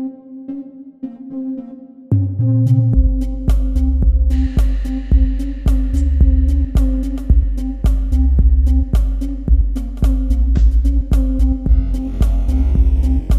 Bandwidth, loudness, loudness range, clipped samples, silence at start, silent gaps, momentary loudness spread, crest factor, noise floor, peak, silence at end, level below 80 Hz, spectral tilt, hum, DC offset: 4.1 kHz; -17 LUFS; 1 LU; under 0.1%; 0 s; none; 14 LU; 12 dB; -35 dBFS; -2 dBFS; 0 s; -14 dBFS; -9 dB/octave; none; under 0.1%